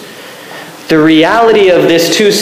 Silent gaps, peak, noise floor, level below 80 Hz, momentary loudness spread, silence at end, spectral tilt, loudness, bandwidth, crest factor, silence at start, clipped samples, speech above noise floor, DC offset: none; 0 dBFS; -29 dBFS; -46 dBFS; 20 LU; 0 s; -4 dB/octave; -7 LUFS; 16 kHz; 8 dB; 0 s; under 0.1%; 22 dB; under 0.1%